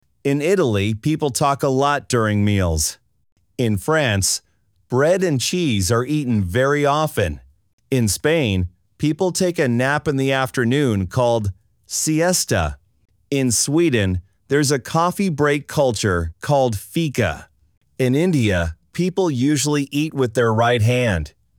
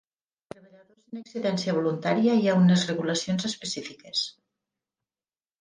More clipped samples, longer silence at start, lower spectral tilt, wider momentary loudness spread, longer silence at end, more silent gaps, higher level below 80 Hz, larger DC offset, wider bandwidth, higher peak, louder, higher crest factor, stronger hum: neither; second, 0.25 s vs 1.1 s; about the same, -5 dB/octave vs -5.5 dB/octave; second, 6 LU vs 14 LU; second, 0.3 s vs 1.3 s; first, 3.32-3.36 s, 7.73-7.78 s vs none; first, -40 dBFS vs -70 dBFS; neither; first, over 20 kHz vs 9.8 kHz; first, -4 dBFS vs -10 dBFS; first, -19 LUFS vs -25 LUFS; about the same, 14 dB vs 16 dB; neither